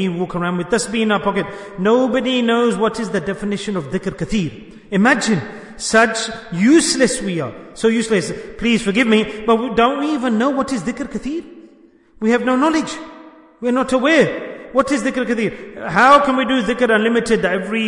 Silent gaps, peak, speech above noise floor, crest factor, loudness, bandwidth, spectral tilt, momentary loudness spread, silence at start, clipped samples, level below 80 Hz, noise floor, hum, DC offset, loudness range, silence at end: none; 0 dBFS; 32 dB; 18 dB; -17 LUFS; 11 kHz; -4.5 dB/octave; 11 LU; 0 s; under 0.1%; -46 dBFS; -49 dBFS; none; under 0.1%; 4 LU; 0 s